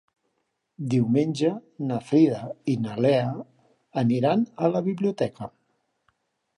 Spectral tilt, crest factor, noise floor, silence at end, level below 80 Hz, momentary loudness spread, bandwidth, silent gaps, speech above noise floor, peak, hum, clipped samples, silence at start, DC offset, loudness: -8 dB/octave; 18 dB; -76 dBFS; 1.1 s; -68 dBFS; 12 LU; 11 kHz; none; 53 dB; -8 dBFS; none; under 0.1%; 0.8 s; under 0.1%; -25 LUFS